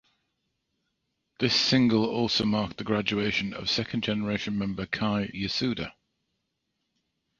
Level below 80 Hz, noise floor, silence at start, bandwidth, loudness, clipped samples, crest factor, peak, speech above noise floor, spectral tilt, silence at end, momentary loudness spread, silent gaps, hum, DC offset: -56 dBFS; -80 dBFS; 1.4 s; 7.6 kHz; -27 LUFS; under 0.1%; 20 dB; -10 dBFS; 53 dB; -5 dB/octave; 1.5 s; 9 LU; none; none; under 0.1%